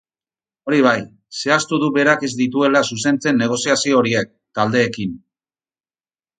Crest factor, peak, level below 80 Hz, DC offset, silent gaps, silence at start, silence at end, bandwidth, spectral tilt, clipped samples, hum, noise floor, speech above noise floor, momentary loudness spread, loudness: 18 dB; 0 dBFS; -60 dBFS; under 0.1%; none; 0.65 s; 1.25 s; 9.6 kHz; -4 dB/octave; under 0.1%; none; under -90 dBFS; over 73 dB; 10 LU; -17 LUFS